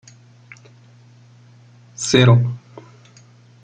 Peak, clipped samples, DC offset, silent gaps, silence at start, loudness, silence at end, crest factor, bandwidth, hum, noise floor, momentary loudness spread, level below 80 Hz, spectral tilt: -2 dBFS; under 0.1%; under 0.1%; none; 2 s; -16 LUFS; 1.05 s; 20 dB; 9.2 kHz; 60 Hz at -35 dBFS; -48 dBFS; 23 LU; -56 dBFS; -5.5 dB/octave